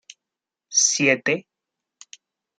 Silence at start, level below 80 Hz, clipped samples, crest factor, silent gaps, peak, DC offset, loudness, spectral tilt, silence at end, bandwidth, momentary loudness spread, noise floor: 0.7 s; -78 dBFS; under 0.1%; 22 dB; none; -4 dBFS; under 0.1%; -19 LUFS; -1.5 dB/octave; 1.15 s; 11 kHz; 8 LU; -87 dBFS